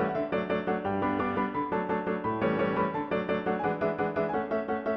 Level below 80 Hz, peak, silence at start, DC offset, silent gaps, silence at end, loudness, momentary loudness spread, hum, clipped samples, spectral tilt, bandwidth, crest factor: -58 dBFS; -14 dBFS; 0 s; under 0.1%; none; 0 s; -30 LUFS; 3 LU; none; under 0.1%; -9 dB/octave; 5.8 kHz; 14 dB